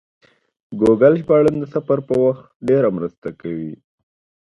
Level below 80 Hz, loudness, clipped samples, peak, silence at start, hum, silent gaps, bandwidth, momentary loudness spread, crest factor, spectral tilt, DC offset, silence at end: -54 dBFS; -17 LUFS; under 0.1%; 0 dBFS; 0.7 s; none; 2.55-2.60 s, 3.18-3.22 s; 10.5 kHz; 15 LU; 18 dB; -9 dB/octave; under 0.1%; 0.75 s